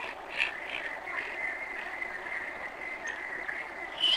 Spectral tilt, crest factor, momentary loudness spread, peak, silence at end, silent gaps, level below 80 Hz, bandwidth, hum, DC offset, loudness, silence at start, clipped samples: -1 dB/octave; 24 dB; 6 LU; -12 dBFS; 0 s; none; -64 dBFS; 16 kHz; none; under 0.1%; -34 LUFS; 0 s; under 0.1%